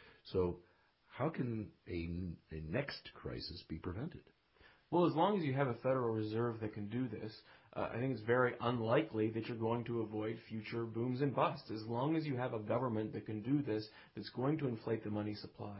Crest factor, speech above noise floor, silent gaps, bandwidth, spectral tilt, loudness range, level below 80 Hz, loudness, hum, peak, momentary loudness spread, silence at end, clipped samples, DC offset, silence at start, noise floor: 20 dB; 29 dB; none; 5.6 kHz; -6 dB/octave; 6 LU; -62 dBFS; -39 LUFS; none; -20 dBFS; 13 LU; 0 s; under 0.1%; under 0.1%; 0 s; -67 dBFS